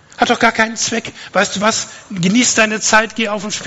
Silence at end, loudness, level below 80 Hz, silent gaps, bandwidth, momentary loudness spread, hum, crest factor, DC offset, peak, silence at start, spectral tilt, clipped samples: 0 s; -14 LUFS; -50 dBFS; none; 10.5 kHz; 8 LU; none; 16 dB; under 0.1%; 0 dBFS; 0.2 s; -2.5 dB/octave; 0.2%